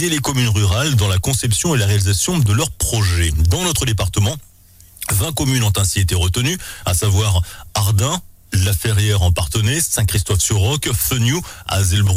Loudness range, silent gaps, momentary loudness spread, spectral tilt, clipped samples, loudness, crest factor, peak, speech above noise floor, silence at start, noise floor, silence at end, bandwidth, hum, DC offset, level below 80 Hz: 2 LU; none; 5 LU; -4 dB/octave; under 0.1%; -17 LUFS; 10 dB; -6 dBFS; 29 dB; 0 s; -45 dBFS; 0 s; 16 kHz; none; under 0.1%; -30 dBFS